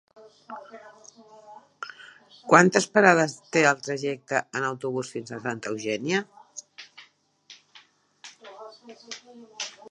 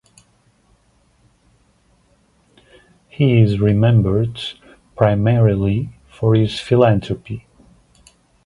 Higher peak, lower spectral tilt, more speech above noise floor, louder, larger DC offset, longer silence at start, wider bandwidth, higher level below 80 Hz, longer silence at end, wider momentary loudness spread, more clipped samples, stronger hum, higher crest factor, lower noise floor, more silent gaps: about the same, 0 dBFS vs 0 dBFS; second, -4.5 dB/octave vs -8.5 dB/octave; second, 33 dB vs 43 dB; second, -24 LUFS vs -17 LUFS; neither; second, 0.5 s vs 3.2 s; about the same, 11.5 kHz vs 10.5 kHz; second, -76 dBFS vs -42 dBFS; second, 0.2 s vs 1.05 s; first, 27 LU vs 14 LU; neither; neither; first, 26 dB vs 18 dB; about the same, -58 dBFS vs -58 dBFS; neither